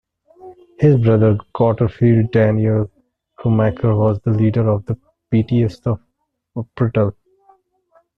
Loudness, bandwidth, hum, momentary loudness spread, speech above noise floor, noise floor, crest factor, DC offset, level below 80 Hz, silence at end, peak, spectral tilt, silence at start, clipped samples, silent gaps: -17 LUFS; 5.2 kHz; none; 13 LU; 56 dB; -71 dBFS; 14 dB; under 0.1%; -46 dBFS; 1.05 s; -2 dBFS; -10.5 dB/octave; 0.45 s; under 0.1%; none